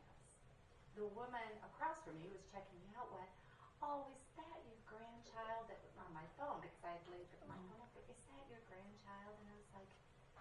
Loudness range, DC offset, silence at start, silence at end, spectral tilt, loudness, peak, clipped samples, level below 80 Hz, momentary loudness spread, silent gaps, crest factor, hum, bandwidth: 6 LU; under 0.1%; 0 s; 0 s; -5.5 dB/octave; -54 LUFS; -34 dBFS; under 0.1%; -74 dBFS; 17 LU; none; 22 dB; none; 11 kHz